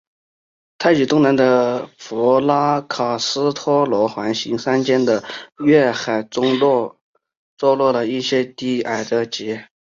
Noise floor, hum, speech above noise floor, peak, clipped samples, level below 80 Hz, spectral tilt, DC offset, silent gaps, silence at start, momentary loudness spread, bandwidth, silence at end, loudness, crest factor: under -90 dBFS; none; over 73 dB; -2 dBFS; under 0.1%; -62 dBFS; -5 dB/octave; under 0.1%; 7.01-7.13 s, 7.37-7.57 s; 0.8 s; 8 LU; 7.6 kHz; 0.25 s; -18 LUFS; 16 dB